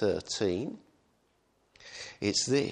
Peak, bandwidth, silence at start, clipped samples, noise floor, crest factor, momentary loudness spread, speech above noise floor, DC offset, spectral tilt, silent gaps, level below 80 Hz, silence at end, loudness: -14 dBFS; 10 kHz; 0 s; under 0.1%; -71 dBFS; 18 dB; 18 LU; 41 dB; under 0.1%; -3.5 dB/octave; none; -64 dBFS; 0 s; -31 LUFS